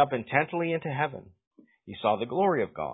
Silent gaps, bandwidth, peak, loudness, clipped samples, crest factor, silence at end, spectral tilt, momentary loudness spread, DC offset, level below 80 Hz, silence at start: 1.47-1.51 s; 4 kHz; -8 dBFS; -28 LUFS; under 0.1%; 22 dB; 0 s; -10.5 dB/octave; 6 LU; under 0.1%; -64 dBFS; 0 s